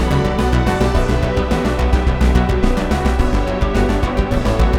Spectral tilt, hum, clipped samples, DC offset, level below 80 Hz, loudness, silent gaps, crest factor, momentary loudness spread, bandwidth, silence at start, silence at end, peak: -6.5 dB/octave; none; under 0.1%; 0.1%; -18 dBFS; -17 LUFS; none; 12 dB; 3 LU; 13 kHz; 0 s; 0 s; -2 dBFS